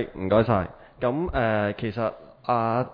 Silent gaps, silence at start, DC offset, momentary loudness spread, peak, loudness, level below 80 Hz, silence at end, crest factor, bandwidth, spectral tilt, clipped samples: none; 0 s; under 0.1%; 9 LU; -8 dBFS; -25 LUFS; -44 dBFS; 0 s; 18 dB; 5.2 kHz; -10 dB/octave; under 0.1%